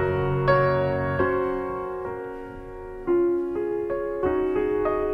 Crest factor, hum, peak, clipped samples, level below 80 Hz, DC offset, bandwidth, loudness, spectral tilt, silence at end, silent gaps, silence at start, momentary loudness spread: 18 dB; none; -8 dBFS; under 0.1%; -44 dBFS; under 0.1%; 5.6 kHz; -25 LUFS; -9.5 dB/octave; 0 s; none; 0 s; 14 LU